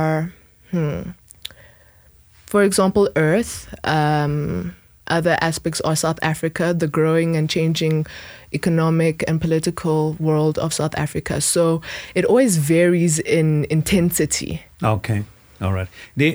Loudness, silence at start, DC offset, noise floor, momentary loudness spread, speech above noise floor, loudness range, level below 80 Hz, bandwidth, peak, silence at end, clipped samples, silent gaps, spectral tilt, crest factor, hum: -19 LUFS; 0 s; under 0.1%; -51 dBFS; 12 LU; 32 dB; 3 LU; -46 dBFS; over 20 kHz; -4 dBFS; 0 s; under 0.1%; none; -5.5 dB/octave; 16 dB; none